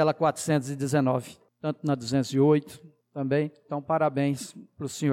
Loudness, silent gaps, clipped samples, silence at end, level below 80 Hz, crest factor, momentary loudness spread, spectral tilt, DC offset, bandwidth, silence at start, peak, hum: -27 LUFS; none; under 0.1%; 0 s; -70 dBFS; 14 dB; 14 LU; -6.5 dB/octave; under 0.1%; 15.5 kHz; 0 s; -12 dBFS; none